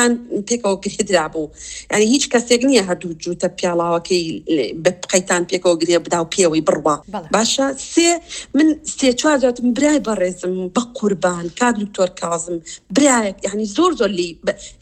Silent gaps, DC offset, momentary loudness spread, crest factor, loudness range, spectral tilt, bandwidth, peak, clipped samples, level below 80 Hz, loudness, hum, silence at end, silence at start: none; under 0.1%; 8 LU; 18 dB; 2 LU; -3.5 dB/octave; 14.5 kHz; 0 dBFS; under 0.1%; -50 dBFS; -18 LUFS; none; 0.1 s; 0 s